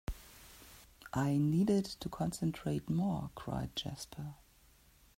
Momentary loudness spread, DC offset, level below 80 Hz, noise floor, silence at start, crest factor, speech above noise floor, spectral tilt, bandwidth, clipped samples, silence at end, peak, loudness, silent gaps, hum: 23 LU; under 0.1%; -56 dBFS; -65 dBFS; 0.1 s; 16 dB; 30 dB; -6.5 dB/octave; 16 kHz; under 0.1%; 0.85 s; -20 dBFS; -36 LUFS; none; none